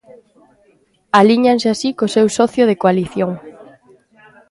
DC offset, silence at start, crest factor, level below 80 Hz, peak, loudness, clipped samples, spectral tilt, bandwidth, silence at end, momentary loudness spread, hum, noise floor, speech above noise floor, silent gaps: under 0.1%; 1.15 s; 16 dB; -56 dBFS; 0 dBFS; -14 LUFS; under 0.1%; -5.5 dB/octave; 11.5 kHz; 0.85 s; 9 LU; none; -56 dBFS; 43 dB; none